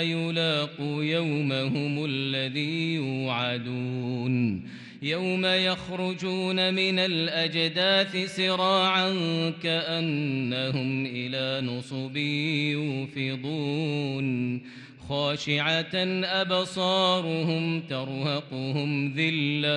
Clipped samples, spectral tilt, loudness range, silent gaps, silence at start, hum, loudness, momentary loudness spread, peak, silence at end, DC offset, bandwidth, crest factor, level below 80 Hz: under 0.1%; -5.5 dB/octave; 5 LU; none; 0 s; none; -27 LUFS; 8 LU; -10 dBFS; 0 s; under 0.1%; 11 kHz; 16 dB; -68 dBFS